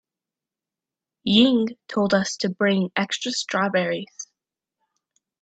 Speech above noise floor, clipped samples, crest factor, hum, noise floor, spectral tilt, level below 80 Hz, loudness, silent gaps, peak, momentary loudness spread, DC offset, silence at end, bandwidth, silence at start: 67 dB; under 0.1%; 20 dB; none; -89 dBFS; -4.5 dB/octave; -64 dBFS; -22 LUFS; none; -4 dBFS; 14 LU; under 0.1%; 1.15 s; 9 kHz; 1.25 s